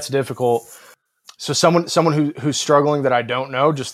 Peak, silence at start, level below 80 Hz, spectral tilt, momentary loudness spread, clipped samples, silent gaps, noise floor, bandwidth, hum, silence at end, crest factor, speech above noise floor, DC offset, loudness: 0 dBFS; 0 s; -66 dBFS; -4.5 dB/octave; 7 LU; under 0.1%; none; -49 dBFS; 15.5 kHz; none; 0 s; 18 dB; 31 dB; under 0.1%; -18 LUFS